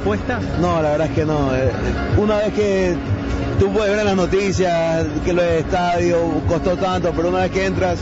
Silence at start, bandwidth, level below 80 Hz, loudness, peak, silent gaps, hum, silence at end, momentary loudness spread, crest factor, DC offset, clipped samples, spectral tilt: 0 s; 8 kHz; -32 dBFS; -18 LUFS; -4 dBFS; none; none; 0 s; 3 LU; 12 dB; under 0.1%; under 0.1%; -6.5 dB/octave